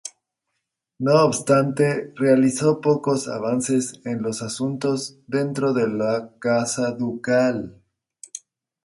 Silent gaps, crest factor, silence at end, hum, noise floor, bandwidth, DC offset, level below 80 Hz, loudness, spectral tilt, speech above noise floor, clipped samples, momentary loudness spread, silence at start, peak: none; 18 dB; 0.45 s; none; -79 dBFS; 11.5 kHz; under 0.1%; -64 dBFS; -22 LUFS; -5.5 dB/octave; 58 dB; under 0.1%; 10 LU; 0.05 s; -4 dBFS